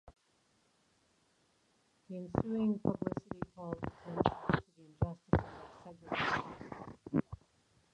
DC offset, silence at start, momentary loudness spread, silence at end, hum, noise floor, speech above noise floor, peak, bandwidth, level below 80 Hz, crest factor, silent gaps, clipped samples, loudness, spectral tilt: under 0.1%; 0.05 s; 16 LU; 0.6 s; none; -74 dBFS; 38 dB; -12 dBFS; 9.4 kHz; -54 dBFS; 28 dB; none; under 0.1%; -37 LUFS; -7.5 dB/octave